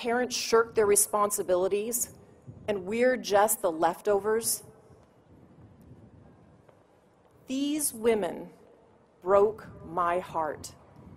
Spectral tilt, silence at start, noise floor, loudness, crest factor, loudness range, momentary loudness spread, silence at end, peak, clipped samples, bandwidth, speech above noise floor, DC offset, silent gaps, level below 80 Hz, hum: -3 dB/octave; 0 s; -61 dBFS; -27 LUFS; 20 dB; 9 LU; 13 LU; 0 s; -10 dBFS; under 0.1%; 16 kHz; 34 dB; under 0.1%; none; -62 dBFS; none